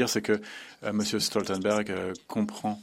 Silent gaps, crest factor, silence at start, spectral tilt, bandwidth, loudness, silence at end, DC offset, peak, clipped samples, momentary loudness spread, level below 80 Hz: none; 18 dB; 0 s; -4 dB/octave; 16 kHz; -29 LUFS; 0 s; under 0.1%; -10 dBFS; under 0.1%; 7 LU; -70 dBFS